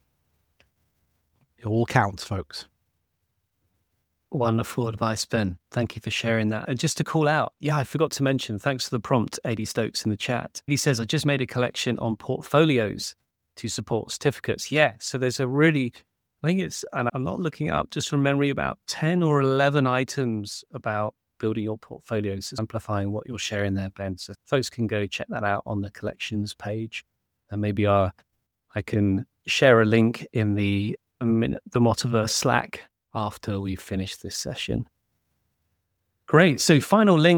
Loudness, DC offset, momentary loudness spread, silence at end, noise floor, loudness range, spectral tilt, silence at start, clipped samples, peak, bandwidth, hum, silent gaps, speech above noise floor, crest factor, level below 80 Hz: -25 LUFS; under 0.1%; 11 LU; 0 s; -76 dBFS; 7 LU; -5.5 dB/octave; 1.65 s; under 0.1%; -2 dBFS; 19.5 kHz; none; none; 52 dB; 22 dB; -56 dBFS